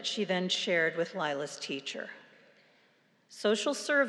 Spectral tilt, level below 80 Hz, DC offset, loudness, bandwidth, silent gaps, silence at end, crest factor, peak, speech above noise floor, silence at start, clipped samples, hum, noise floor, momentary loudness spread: -3 dB/octave; under -90 dBFS; under 0.1%; -31 LUFS; 12.5 kHz; none; 0 s; 18 dB; -14 dBFS; 36 dB; 0 s; under 0.1%; none; -68 dBFS; 14 LU